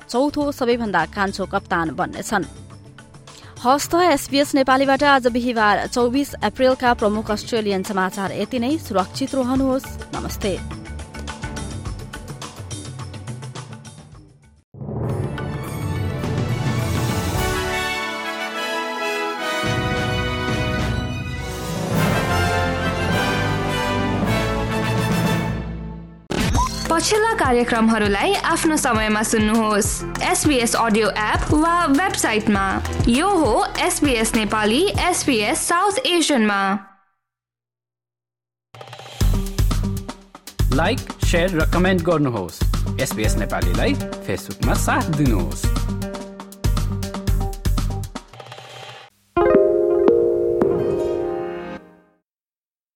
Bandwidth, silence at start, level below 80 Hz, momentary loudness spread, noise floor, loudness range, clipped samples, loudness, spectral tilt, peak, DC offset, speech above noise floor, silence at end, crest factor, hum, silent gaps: 17 kHz; 0 s; -32 dBFS; 15 LU; under -90 dBFS; 9 LU; under 0.1%; -20 LUFS; -4.5 dB/octave; -2 dBFS; under 0.1%; over 71 dB; 1.15 s; 18 dB; none; 14.64-14.72 s